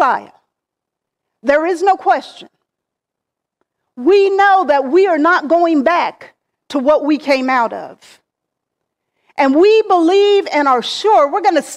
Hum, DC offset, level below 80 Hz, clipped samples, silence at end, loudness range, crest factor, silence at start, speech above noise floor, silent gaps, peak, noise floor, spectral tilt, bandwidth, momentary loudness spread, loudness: none; under 0.1%; -60 dBFS; under 0.1%; 0 s; 6 LU; 12 dB; 0 s; 68 dB; none; -2 dBFS; -81 dBFS; -3 dB/octave; 11.5 kHz; 8 LU; -13 LUFS